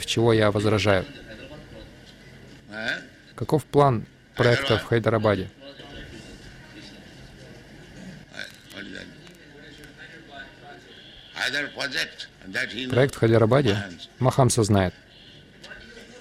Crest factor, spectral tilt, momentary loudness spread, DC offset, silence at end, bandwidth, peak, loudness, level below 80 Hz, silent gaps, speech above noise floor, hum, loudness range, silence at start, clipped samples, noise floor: 20 dB; -5.5 dB/octave; 25 LU; under 0.1%; 0 s; 15 kHz; -6 dBFS; -23 LUFS; -52 dBFS; none; 27 dB; none; 19 LU; 0 s; under 0.1%; -49 dBFS